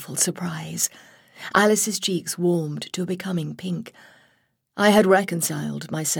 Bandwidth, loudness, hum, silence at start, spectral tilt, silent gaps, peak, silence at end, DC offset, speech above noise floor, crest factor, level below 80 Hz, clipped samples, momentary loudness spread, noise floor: 19.5 kHz; -22 LUFS; none; 0 s; -4 dB/octave; none; -4 dBFS; 0 s; under 0.1%; 43 dB; 20 dB; -66 dBFS; under 0.1%; 13 LU; -66 dBFS